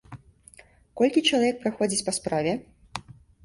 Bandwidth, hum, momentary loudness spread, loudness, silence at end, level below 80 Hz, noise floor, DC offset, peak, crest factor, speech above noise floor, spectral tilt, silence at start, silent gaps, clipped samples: 11.5 kHz; none; 18 LU; -25 LUFS; 0.35 s; -58 dBFS; -54 dBFS; under 0.1%; -8 dBFS; 20 dB; 29 dB; -3.5 dB/octave; 0.1 s; none; under 0.1%